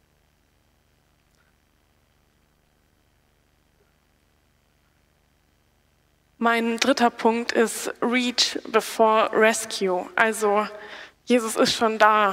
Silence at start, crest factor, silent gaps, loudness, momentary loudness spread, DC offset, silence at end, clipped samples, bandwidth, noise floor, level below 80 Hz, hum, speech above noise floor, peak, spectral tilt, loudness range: 6.4 s; 22 dB; none; -21 LUFS; 7 LU; under 0.1%; 0 s; under 0.1%; 16 kHz; -64 dBFS; -66 dBFS; none; 43 dB; -4 dBFS; -2.5 dB/octave; 6 LU